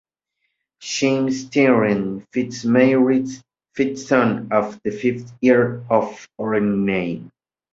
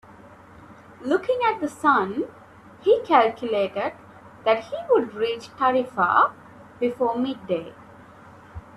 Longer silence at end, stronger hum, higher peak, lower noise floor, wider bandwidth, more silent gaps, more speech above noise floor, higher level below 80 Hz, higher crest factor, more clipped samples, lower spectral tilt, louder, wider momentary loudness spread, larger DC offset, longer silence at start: first, 0.45 s vs 0 s; neither; about the same, -2 dBFS vs -4 dBFS; first, -75 dBFS vs -47 dBFS; second, 7.8 kHz vs 12.5 kHz; neither; first, 56 dB vs 25 dB; about the same, -58 dBFS vs -60 dBFS; about the same, 18 dB vs 20 dB; neither; about the same, -6 dB/octave vs -5.5 dB/octave; first, -19 LUFS vs -23 LUFS; about the same, 13 LU vs 11 LU; neither; first, 0.8 s vs 0.6 s